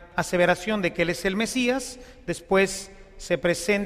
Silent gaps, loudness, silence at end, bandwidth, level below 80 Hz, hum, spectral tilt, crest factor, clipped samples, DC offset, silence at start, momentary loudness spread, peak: none; -25 LUFS; 0 s; 15.5 kHz; -48 dBFS; none; -4 dB/octave; 18 dB; under 0.1%; under 0.1%; 0 s; 14 LU; -8 dBFS